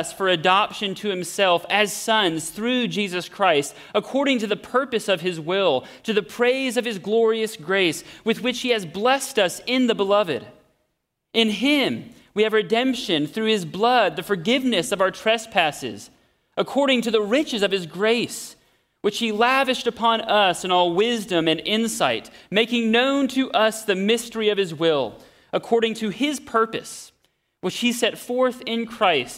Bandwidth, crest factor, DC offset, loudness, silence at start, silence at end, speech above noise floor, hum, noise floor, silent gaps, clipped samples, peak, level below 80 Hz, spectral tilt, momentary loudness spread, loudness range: 16 kHz; 20 dB; under 0.1%; -21 LUFS; 0 s; 0 s; 54 dB; none; -75 dBFS; none; under 0.1%; -2 dBFS; -64 dBFS; -3.5 dB/octave; 8 LU; 3 LU